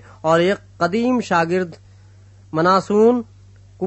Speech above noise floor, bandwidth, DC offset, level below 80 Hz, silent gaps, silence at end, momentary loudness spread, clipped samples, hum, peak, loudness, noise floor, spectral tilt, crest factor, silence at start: 29 dB; 8.4 kHz; under 0.1%; -56 dBFS; none; 0 s; 10 LU; under 0.1%; none; -2 dBFS; -18 LUFS; -46 dBFS; -6 dB/octave; 16 dB; 0.25 s